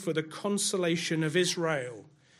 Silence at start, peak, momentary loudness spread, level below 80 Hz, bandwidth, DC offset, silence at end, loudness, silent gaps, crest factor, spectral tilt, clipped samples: 0 s; -14 dBFS; 8 LU; -76 dBFS; 14.5 kHz; under 0.1%; 0.35 s; -29 LUFS; none; 16 dB; -4 dB/octave; under 0.1%